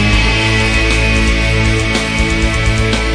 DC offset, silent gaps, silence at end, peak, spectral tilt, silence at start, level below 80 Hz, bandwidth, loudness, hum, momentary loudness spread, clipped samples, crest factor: under 0.1%; none; 0 s; 0 dBFS; -4.5 dB/octave; 0 s; -16 dBFS; 10.5 kHz; -12 LUFS; none; 2 LU; under 0.1%; 12 dB